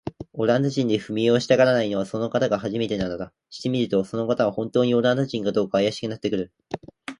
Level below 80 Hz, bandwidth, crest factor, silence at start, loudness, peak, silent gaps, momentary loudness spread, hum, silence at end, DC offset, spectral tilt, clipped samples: -56 dBFS; 11 kHz; 18 dB; 0.05 s; -23 LUFS; -4 dBFS; none; 13 LU; none; 0.05 s; under 0.1%; -6 dB/octave; under 0.1%